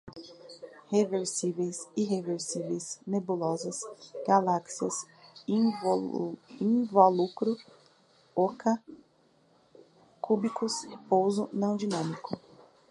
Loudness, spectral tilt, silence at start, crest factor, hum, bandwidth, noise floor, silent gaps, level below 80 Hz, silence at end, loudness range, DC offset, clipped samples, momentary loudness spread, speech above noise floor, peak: -30 LUFS; -5.5 dB/octave; 0.05 s; 24 dB; none; 11.5 kHz; -65 dBFS; none; -76 dBFS; 0.5 s; 5 LU; under 0.1%; under 0.1%; 15 LU; 36 dB; -6 dBFS